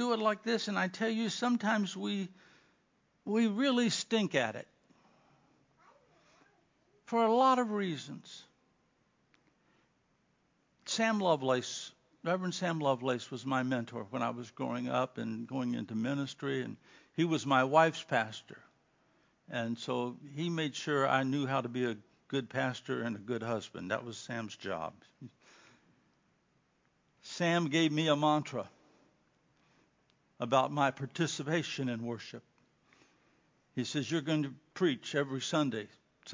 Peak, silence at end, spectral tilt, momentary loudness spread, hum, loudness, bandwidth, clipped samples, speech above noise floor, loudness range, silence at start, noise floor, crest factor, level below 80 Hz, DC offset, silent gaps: -12 dBFS; 0 s; -5 dB/octave; 13 LU; none; -33 LUFS; 7.6 kHz; under 0.1%; 41 dB; 6 LU; 0 s; -74 dBFS; 24 dB; -80 dBFS; under 0.1%; none